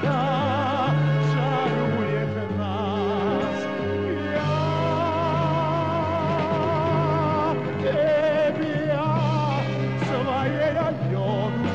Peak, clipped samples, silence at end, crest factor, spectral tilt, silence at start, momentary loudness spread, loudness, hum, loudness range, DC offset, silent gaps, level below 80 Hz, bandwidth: -12 dBFS; under 0.1%; 0 s; 12 dB; -7.5 dB/octave; 0 s; 4 LU; -24 LUFS; none; 2 LU; 0.4%; none; -56 dBFS; 7.8 kHz